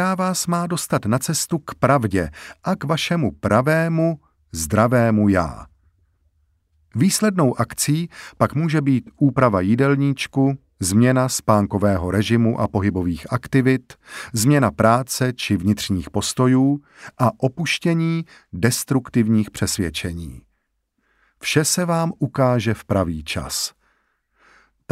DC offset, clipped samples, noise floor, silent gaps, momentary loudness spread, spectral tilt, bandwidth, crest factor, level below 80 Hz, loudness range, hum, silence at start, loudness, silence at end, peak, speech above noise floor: under 0.1%; under 0.1%; -71 dBFS; none; 10 LU; -5.5 dB/octave; 16 kHz; 20 dB; -46 dBFS; 4 LU; none; 0 s; -20 LUFS; 1.25 s; 0 dBFS; 52 dB